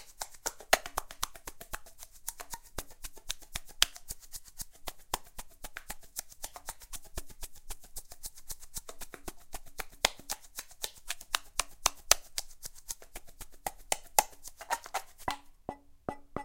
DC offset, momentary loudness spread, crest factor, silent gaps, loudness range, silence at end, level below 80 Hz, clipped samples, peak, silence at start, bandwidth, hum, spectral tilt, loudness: under 0.1%; 18 LU; 38 dB; none; 12 LU; 0 s; -52 dBFS; under 0.1%; 0 dBFS; 0 s; 17 kHz; none; 0 dB/octave; -36 LUFS